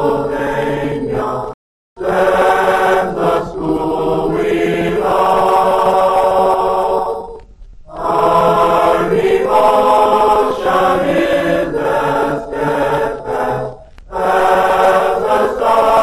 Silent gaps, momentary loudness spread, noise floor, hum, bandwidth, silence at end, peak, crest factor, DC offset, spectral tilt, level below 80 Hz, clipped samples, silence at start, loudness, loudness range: 1.54-1.96 s; 8 LU; -36 dBFS; none; 13.5 kHz; 0 s; -2 dBFS; 12 dB; under 0.1%; -5.5 dB/octave; -38 dBFS; under 0.1%; 0 s; -14 LUFS; 3 LU